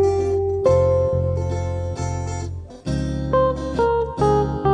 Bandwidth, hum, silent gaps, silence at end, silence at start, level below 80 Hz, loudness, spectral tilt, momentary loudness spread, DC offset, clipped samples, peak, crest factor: 9.8 kHz; none; none; 0 s; 0 s; -34 dBFS; -21 LUFS; -7.5 dB/octave; 10 LU; under 0.1%; under 0.1%; -6 dBFS; 14 dB